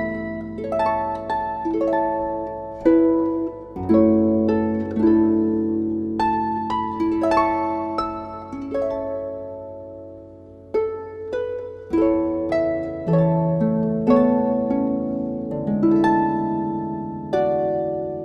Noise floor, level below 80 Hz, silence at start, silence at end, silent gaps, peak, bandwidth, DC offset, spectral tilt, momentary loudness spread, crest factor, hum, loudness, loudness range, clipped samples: -42 dBFS; -48 dBFS; 0 s; 0 s; none; -4 dBFS; 6.4 kHz; under 0.1%; -9 dB/octave; 12 LU; 16 dB; none; -21 LUFS; 8 LU; under 0.1%